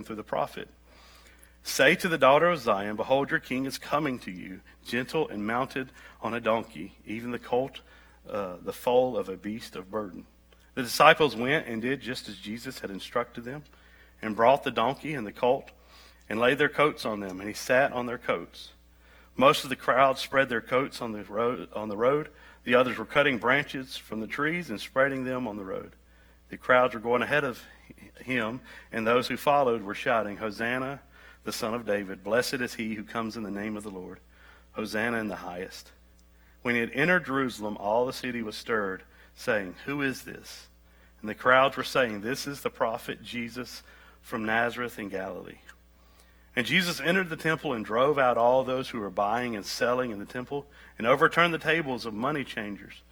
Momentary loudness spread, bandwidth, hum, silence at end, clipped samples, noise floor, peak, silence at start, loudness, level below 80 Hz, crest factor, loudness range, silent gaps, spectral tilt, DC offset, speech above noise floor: 16 LU; over 20 kHz; none; 0.15 s; under 0.1%; -57 dBFS; -2 dBFS; 0 s; -28 LUFS; -58 dBFS; 26 dB; 6 LU; none; -4.5 dB/octave; under 0.1%; 29 dB